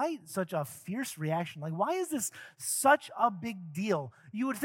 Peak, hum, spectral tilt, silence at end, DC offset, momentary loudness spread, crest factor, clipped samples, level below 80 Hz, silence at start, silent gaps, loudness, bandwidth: -12 dBFS; none; -4.5 dB/octave; 0 s; under 0.1%; 12 LU; 22 dB; under 0.1%; -82 dBFS; 0 s; none; -32 LUFS; 17 kHz